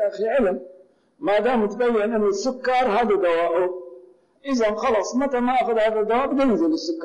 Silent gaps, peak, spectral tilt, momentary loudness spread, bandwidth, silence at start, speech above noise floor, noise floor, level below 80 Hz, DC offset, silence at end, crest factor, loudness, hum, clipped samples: none; -12 dBFS; -5 dB/octave; 5 LU; 10 kHz; 0 s; 29 dB; -49 dBFS; -52 dBFS; under 0.1%; 0 s; 8 dB; -21 LUFS; none; under 0.1%